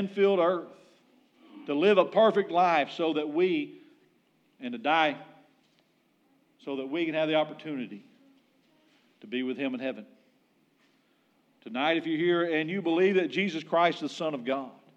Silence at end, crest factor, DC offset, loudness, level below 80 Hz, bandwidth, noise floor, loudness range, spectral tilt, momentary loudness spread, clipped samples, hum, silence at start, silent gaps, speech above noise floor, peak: 0.25 s; 20 dB; under 0.1%; -28 LUFS; under -90 dBFS; 8.4 kHz; -69 dBFS; 11 LU; -6 dB/octave; 15 LU; under 0.1%; none; 0 s; none; 41 dB; -10 dBFS